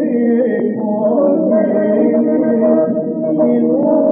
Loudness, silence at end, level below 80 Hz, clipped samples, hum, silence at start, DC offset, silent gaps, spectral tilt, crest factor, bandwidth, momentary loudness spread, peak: -14 LUFS; 0 s; -74 dBFS; under 0.1%; none; 0 s; under 0.1%; none; -10 dB/octave; 12 dB; 3.3 kHz; 4 LU; -2 dBFS